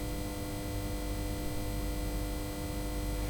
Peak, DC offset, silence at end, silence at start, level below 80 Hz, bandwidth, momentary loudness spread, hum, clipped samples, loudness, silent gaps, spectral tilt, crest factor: -24 dBFS; under 0.1%; 0 s; 0 s; -38 dBFS; over 20 kHz; 1 LU; 50 Hz at -45 dBFS; under 0.1%; -37 LUFS; none; -5 dB/octave; 12 dB